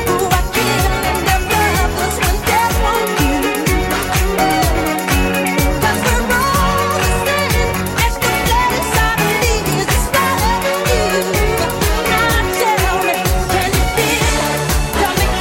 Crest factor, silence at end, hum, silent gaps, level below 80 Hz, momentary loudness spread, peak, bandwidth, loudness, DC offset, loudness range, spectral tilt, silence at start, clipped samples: 14 dB; 0 s; none; none; -22 dBFS; 2 LU; 0 dBFS; 17 kHz; -15 LUFS; under 0.1%; 1 LU; -4 dB/octave; 0 s; under 0.1%